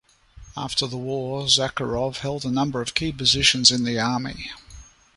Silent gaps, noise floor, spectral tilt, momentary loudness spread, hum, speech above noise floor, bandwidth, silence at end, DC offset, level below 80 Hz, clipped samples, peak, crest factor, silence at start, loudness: none; -47 dBFS; -3 dB/octave; 17 LU; none; 24 dB; 11.5 kHz; 0.35 s; under 0.1%; -46 dBFS; under 0.1%; -2 dBFS; 22 dB; 0.35 s; -21 LUFS